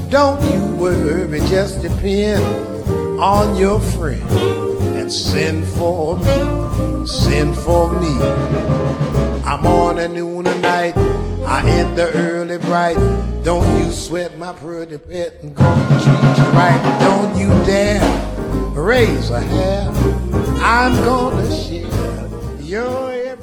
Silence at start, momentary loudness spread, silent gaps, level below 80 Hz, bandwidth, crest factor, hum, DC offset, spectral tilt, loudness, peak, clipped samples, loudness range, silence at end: 0 s; 9 LU; none; -26 dBFS; 19 kHz; 14 dB; none; under 0.1%; -6.5 dB/octave; -16 LUFS; 0 dBFS; under 0.1%; 4 LU; 0 s